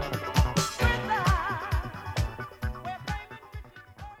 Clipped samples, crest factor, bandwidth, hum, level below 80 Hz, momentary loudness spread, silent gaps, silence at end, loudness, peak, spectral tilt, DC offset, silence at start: under 0.1%; 20 dB; 16.5 kHz; none; -36 dBFS; 19 LU; none; 0.05 s; -29 LUFS; -10 dBFS; -4.5 dB/octave; under 0.1%; 0 s